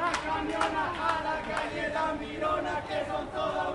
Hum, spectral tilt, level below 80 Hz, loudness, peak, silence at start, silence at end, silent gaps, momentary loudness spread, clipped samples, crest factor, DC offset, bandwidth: none; -4.5 dB/octave; -52 dBFS; -31 LUFS; -12 dBFS; 0 s; 0 s; none; 3 LU; under 0.1%; 18 dB; under 0.1%; 11.5 kHz